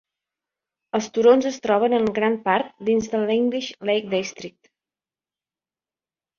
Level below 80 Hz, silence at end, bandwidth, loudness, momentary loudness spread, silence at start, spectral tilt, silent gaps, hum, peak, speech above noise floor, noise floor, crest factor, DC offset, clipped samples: -64 dBFS; 1.9 s; 7.2 kHz; -21 LUFS; 11 LU; 0.95 s; -4.5 dB/octave; none; none; -4 dBFS; over 69 dB; under -90 dBFS; 18 dB; under 0.1%; under 0.1%